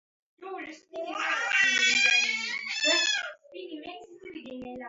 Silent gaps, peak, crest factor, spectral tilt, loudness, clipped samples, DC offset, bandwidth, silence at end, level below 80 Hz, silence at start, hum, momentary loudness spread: none; -10 dBFS; 18 dB; 1 dB/octave; -24 LUFS; under 0.1%; under 0.1%; 8 kHz; 0 s; -74 dBFS; 0.4 s; none; 23 LU